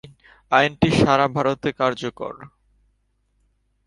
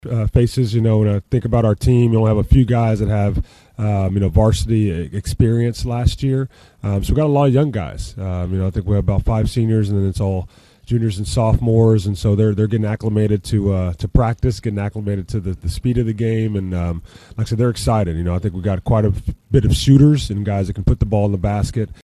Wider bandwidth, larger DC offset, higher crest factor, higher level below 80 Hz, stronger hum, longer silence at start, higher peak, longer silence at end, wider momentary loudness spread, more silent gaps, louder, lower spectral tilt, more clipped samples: about the same, 11.5 kHz vs 12.5 kHz; neither; first, 22 dB vs 16 dB; second, -48 dBFS vs -28 dBFS; neither; about the same, 0.05 s vs 0.05 s; about the same, -2 dBFS vs 0 dBFS; first, 1.4 s vs 0.1 s; first, 16 LU vs 9 LU; neither; about the same, -20 LUFS vs -18 LUFS; second, -6 dB/octave vs -7.5 dB/octave; neither